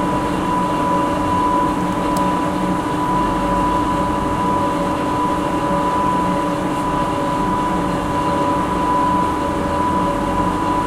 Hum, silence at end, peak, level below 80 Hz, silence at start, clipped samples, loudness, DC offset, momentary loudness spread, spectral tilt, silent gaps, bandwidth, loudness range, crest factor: none; 0 s; -6 dBFS; -34 dBFS; 0 s; under 0.1%; -18 LUFS; under 0.1%; 2 LU; -6 dB/octave; none; 16 kHz; 1 LU; 12 dB